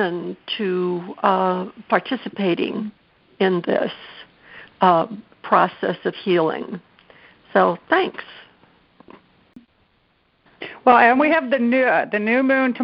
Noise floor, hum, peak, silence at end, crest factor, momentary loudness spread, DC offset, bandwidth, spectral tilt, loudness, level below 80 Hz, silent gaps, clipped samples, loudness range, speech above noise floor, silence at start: -63 dBFS; none; 0 dBFS; 0 s; 20 dB; 16 LU; under 0.1%; 5.6 kHz; -3.5 dB/octave; -19 LUFS; -66 dBFS; none; under 0.1%; 6 LU; 43 dB; 0 s